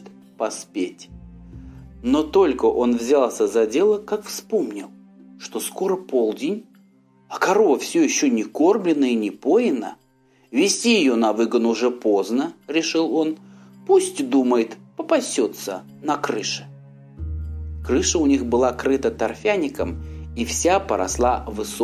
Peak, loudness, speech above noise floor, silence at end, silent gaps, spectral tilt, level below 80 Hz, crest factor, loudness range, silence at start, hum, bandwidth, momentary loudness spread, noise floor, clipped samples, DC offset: -4 dBFS; -21 LUFS; 38 dB; 0 s; none; -4 dB/octave; -42 dBFS; 16 dB; 4 LU; 0 s; none; 15 kHz; 14 LU; -58 dBFS; under 0.1%; under 0.1%